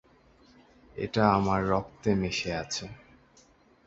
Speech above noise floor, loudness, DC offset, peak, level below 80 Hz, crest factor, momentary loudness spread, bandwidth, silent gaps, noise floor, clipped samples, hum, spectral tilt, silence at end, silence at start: 33 dB; -28 LUFS; under 0.1%; -6 dBFS; -52 dBFS; 24 dB; 13 LU; 8 kHz; none; -60 dBFS; under 0.1%; none; -5.5 dB/octave; 0.9 s; 0.95 s